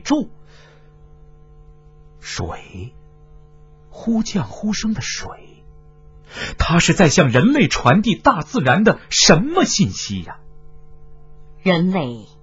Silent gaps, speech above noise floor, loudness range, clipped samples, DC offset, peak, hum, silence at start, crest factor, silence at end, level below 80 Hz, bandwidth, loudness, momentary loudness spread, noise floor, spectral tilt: none; 28 dB; 17 LU; under 0.1%; under 0.1%; 0 dBFS; none; 0.05 s; 20 dB; 0.15 s; -38 dBFS; 8 kHz; -17 LUFS; 20 LU; -45 dBFS; -4.5 dB/octave